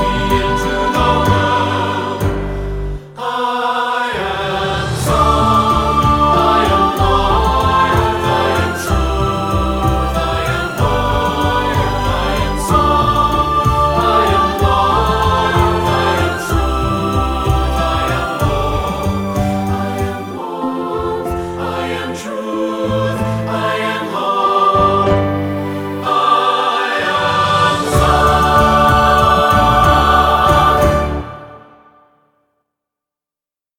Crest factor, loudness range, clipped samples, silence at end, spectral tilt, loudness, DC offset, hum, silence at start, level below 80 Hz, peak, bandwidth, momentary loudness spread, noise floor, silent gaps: 14 dB; 7 LU; under 0.1%; 2.2 s; -5.5 dB/octave; -14 LUFS; under 0.1%; none; 0 s; -24 dBFS; 0 dBFS; 18.5 kHz; 9 LU; -89 dBFS; none